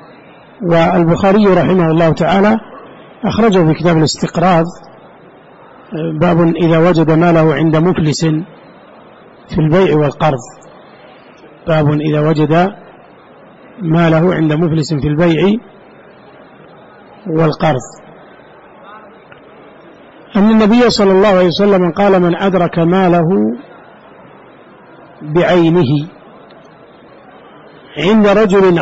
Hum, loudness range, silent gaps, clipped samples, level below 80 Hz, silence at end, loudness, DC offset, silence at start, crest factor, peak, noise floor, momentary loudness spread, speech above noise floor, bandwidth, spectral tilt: none; 6 LU; none; under 0.1%; -40 dBFS; 0 s; -11 LUFS; under 0.1%; 0.6 s; 10 dB; -4 dBFS; -40 dBFS; 11 LU; 29 dB; 8 kHz; -7 dB/octave